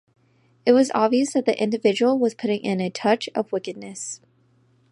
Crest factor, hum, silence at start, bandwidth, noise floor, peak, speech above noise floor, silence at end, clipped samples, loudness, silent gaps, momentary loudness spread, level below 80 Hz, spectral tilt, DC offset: 20 dB; none; 0.65 s; 11.5 kHz; -61 dBFS; -4 dBFS; 40 dB; 0.75 s; under 0.1%; -22 LUFS; none; 14 LU; -74 dBFS; -5 dB/octave; under 0.1%